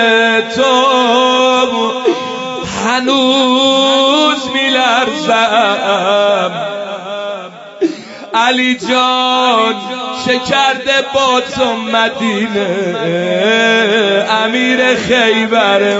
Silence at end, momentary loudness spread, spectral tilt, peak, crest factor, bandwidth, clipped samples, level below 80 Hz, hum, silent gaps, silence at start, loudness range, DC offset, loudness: 0 s; 10 LU; -3 dB/octave; 0 dBFS; 12 dB; 8 kHz; under 0.1%; -52 dBFS; none; none; 0 s; 4 LU; under 0.1%; -12 LUFS